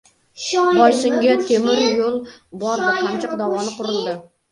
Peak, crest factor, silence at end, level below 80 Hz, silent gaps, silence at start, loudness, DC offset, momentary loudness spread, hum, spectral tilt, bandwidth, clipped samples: 0 dBFS; 18 dB; 0.3 s; -62 dBFS; none; 0.35 s; -18 LUFS; under 0.1%; 14 LU; none; -3.5 dB/octave; 11.5 kHz; under 0.1%